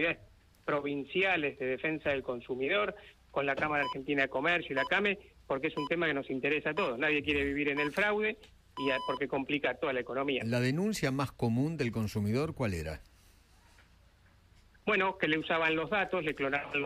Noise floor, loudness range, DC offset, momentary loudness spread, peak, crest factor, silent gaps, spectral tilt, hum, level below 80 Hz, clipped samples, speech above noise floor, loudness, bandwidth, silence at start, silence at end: -63 dBFS; 4 LU; under 0.1%; 7 LU; -14 dBFS; 18 dB; none; -5.5 dB/octave; none; -60 dBFS; under 0.1%; 30 dB; -32 LUFS; 15.5 kHz; 0 s; 0 s